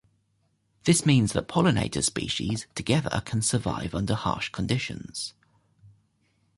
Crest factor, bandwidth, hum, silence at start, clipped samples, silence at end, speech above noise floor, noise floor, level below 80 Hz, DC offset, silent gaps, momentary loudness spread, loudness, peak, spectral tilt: 18 dB; 11.5 kHz; none; 0.85 s; under 0.1%; 0.7 s; 45 dB; -71 dBFS; -48 dBFS; under 0.1%; none; 10 LU; -26 LUFS; -8 dBFS; -4.5 dB/octave